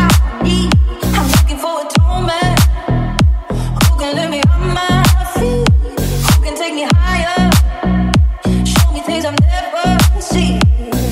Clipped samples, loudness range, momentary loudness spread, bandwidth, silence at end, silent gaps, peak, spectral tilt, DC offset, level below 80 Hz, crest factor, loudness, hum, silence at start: under 0.1%; 1 LU; 5 LU; 16.5 kHz; 0 s; none; 0 dBFS; -5.5 dB/octave; under 0.1%; -16 dBFS; 12 dB; -13 LUFS; none; 0 s